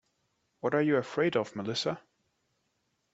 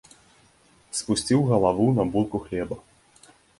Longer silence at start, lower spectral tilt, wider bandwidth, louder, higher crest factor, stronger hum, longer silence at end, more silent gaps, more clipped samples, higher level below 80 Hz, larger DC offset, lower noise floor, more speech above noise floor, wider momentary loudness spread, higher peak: second, 0.65 s vs 0.95 s; about the same, -5.5 dB/octave vs -6 dB/octave; second, 8 kHz vs 11.5 kHz; second, -30 LUFS vs -24 LUFS; about the same, 20 dB vs 20 dB; neither; first, 1.15 s vs 0.8 s; neither; neither; second, -74 dBFS vs -52 dBFS; neither; first, -78 dBFS vs -59 dBFS; first, 48 dB vs 36 dB; second, 8 LU vs 12 LU; second, -14 dBFS vs -6 dBFS